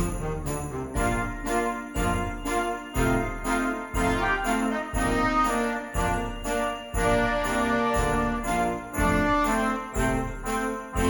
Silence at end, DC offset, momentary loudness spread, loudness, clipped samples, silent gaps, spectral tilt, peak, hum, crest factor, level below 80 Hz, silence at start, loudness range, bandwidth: 0 s; under 0.1%; 6 LU; -26 LUFS; under 0.1%; none; -5 dB/octave; -10 dBFS; none; 16 dB; -34 dBFS; 0 s; 3 LU; 19 kHz